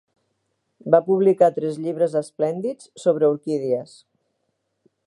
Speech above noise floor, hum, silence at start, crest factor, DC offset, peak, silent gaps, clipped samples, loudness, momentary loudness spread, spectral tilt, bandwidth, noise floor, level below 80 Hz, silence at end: 53 dB; none; 0.85 s; 20 dB; under 0.1%; -2 dBFS; none; under 0.1%; -21 LUFS; 10 LU; -7.5 dB/octave; 11.5 kHz; -74 dBFS; -76 dBFS; 1.25 s